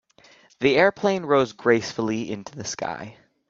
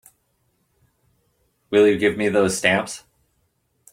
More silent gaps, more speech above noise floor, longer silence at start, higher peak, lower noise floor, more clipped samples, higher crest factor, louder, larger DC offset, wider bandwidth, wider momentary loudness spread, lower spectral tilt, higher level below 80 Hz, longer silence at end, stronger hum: neither; second, 32 dB vs 50 dB; second, 0.6 s vs 1.7 s; about the same, -4 dBFS vs -2 dBFS; second, -54 dBFS vs -68 dBFS; neither; about the same, 20 dB vs 22 dB; second, -23 LUFS vs -19 LUFS; neither; second, 7.8 kHz vs 16 kHz; first, 14 LU vs 11 LU; about the same, -4.5 dB/octave vs -4 dB/octave; about the same, -62 dBFS vs -60 dBFS; second, 0.35 s vs 0.95 s; neither